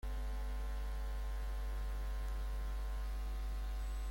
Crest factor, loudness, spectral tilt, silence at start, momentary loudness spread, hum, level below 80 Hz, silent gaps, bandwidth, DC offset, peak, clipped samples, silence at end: 8 dB; -44 LUFS; -5.5 dB/octave; 0.05 s; 0 LU; none; -40 dBFS; none; 16.5 kHz; under 0.1%; -32 dBFS; under 0.1%; 0 s